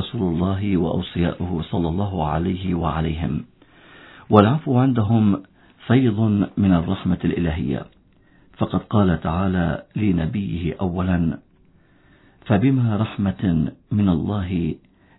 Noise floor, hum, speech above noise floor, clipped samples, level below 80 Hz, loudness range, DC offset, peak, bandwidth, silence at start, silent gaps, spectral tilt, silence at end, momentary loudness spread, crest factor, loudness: -55 dBFS; none; 35 dB; under 0.1%; -40 dBFS; 4 LU; under 0.1%; 0 dBFS; 4.1 kHz; 0 s; none; -12 dB/octave; 0.4 s; 8 LU; 20 dB; -21 LUFS